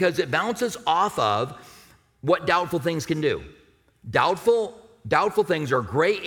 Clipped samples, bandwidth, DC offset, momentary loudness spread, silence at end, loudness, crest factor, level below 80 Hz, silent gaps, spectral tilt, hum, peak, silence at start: under 0.1%; 18.5 kHz; under 0.1%; 10 LU; 0 s; -24 LUFS; 18 dB; -56 dBFS; none; -5 dB/octave; none; -6 dBFS; 0 s